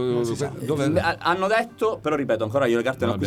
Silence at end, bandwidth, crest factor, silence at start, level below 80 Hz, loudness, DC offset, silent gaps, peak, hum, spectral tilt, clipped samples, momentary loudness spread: 0 s; 15.5 kHz; 14 dB; 0 s; -54 dBFS; -23 LUFS; under 0.1%; none; -8 dBFS; none; -6 dB/octave; under 0.1%; 4 LU